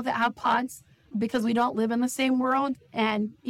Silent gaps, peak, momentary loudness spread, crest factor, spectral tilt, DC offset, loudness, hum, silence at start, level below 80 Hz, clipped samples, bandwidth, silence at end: none; -14 dBFS; 7 LU; 12 dB; -4.5 dB/octave; under 0.1%; -26 LUFS; none; 0 s; -66 dBFS; under 0.1%; 15.5 kHz; 0 s